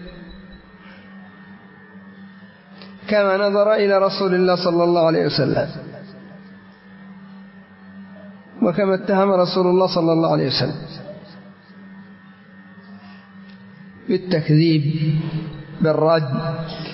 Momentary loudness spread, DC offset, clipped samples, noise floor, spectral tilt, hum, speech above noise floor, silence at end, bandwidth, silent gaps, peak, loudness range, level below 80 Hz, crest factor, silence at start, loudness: 25 LU; under 0.1%; under 0.1%; -44 dBFS; -10 dB/octave; none; 27 dB; 0 s; 6 kHz; none; -4 dBFS; 11 LU; -54 dBFS; 16 dB; 0 s; -18 LUFS